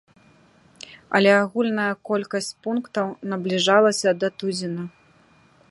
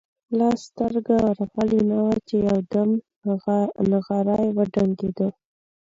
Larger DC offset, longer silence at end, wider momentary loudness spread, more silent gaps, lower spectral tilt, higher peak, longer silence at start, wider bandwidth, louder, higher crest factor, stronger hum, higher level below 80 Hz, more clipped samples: neither; first, 0.8 s vs 0.6 s; first, 15 LU vs 5 LU; second, none vs 3.16-3.22 s; second, -4.5 dB/octave vs -8.5 dB/octave; first, -4 dBFS vs -8 dBFS; first, 0.9 s vs 0.3 s; first, 11.5 kHz vs 7.6 kHz; about the same, -22 LUFS vs -23 LUFS; first, 20 dB vs 14 dB; neither; second, -70 dBFS vs -54 dBFS; neither